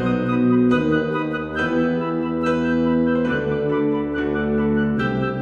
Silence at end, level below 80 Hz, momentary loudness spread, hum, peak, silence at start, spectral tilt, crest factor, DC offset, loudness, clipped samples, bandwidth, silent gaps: 0 s; -42 dBFS; 5 LU; none; -6 dBFS; 0 s; -8.5 dB/octave; 14 dB; under 0.1%; -20 LUFS; under 0.1%; 7 kHz; none